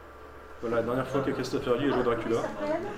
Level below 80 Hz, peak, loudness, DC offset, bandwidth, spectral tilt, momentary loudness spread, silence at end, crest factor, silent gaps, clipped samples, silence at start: -52 dBFS; -12 dBFS; -29 LUFS; under 0.1%; 15.5 kHz; -6 dB/octave; 16 LU; 0 s; 18 dB; none; under 0.1%; 0 s